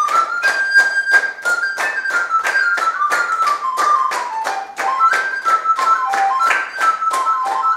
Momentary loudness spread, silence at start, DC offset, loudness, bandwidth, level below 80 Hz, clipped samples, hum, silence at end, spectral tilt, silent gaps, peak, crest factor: 6 LU; 0 s; under 0.1%; -16 LUFS; 16 kHz; -70 dBFS; under 0.1%; none; 0 s; 1 dB/octave; none; 0 dBFS; 16 dB